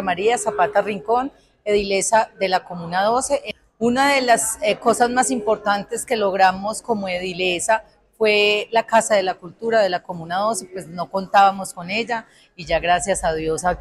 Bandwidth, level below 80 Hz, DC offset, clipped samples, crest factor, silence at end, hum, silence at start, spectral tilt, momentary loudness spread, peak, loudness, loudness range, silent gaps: 14 kHz; -48 dBFS; under 0.1%; under 0.1%; 16 dB; 0 s; none; 0 s; -3 dB/octave; 10 LU; -4 dBFS; -20 LUFS; 2 LU; none